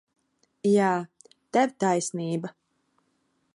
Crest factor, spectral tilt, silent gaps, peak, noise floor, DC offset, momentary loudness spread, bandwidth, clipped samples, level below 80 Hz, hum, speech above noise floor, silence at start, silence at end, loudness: 18 dB; -5.5 dB/octave; none; -10 dBFS; -72 dBFS; under 0.1%; 11 LU; 11.5 kHz; under 0.1%; -78 dBFS; none; 48 dB; 0.65 s; 1.05 s; -26 LUFS